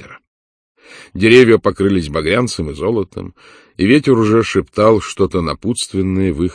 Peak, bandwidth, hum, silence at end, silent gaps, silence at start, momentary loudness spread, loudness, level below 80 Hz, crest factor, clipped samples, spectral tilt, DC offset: 0 dBFS; 11 kHz; none; 0 s; 0.27-0.75 s; 0 s; 11 LU; -14 LUFS; -38 dBFS; 14 dB; 0.2%; -6 dB/octave; under 0.1%